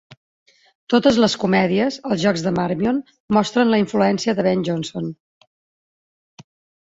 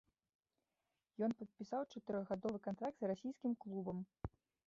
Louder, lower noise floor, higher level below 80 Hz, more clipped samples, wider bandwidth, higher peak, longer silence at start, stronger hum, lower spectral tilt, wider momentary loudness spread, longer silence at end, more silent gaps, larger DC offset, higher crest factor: first, -19 LUFS vs -45 LUFS; about the same, under -90 dBFS vs under -90 dBFS; first, -56 dBFS vs -68 dBFS; neither; about the same, 8 kHz vs 7.6 kHz; first, -2 dBFS vs -28 dBFS; second, 0.1 s vs 1.2 s; neither; second, -5.5 dB/octave vs -7.5 dB/octave; about the same, 8 LU vs 9 LU; first, 1.7 s vs 0.4 s; first, 0.17-0.46 s, 0.75-0.87 s, 3.20-3.28 s vs none; neither; about the same, 18 dB vs 18 dB